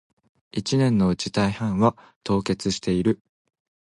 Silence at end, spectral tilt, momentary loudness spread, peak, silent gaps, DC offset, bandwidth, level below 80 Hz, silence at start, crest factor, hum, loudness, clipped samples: 0.85 s; -6 dB/octave; 10 LU; -6 dBFS; 2.16-2.21 s; under 0.1%; 11.5 kHz; -48 dBFS; 0.55 s; 18 dB; none; -23 LUFS; under 0.1%